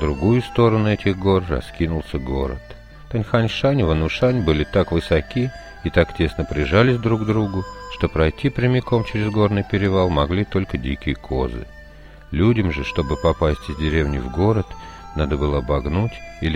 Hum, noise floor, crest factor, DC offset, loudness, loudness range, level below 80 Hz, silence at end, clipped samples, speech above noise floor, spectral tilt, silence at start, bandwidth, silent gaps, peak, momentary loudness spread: none; -41 dBFS; 18 dB; under 0.1%; -20 LUFS; 2 LU; -32 dBFS; 0 s; under 0.1%; 22 dB; -7.5 dB/octave; 0 s; 10.5 kHz; none; -2 dBFS; 9 LU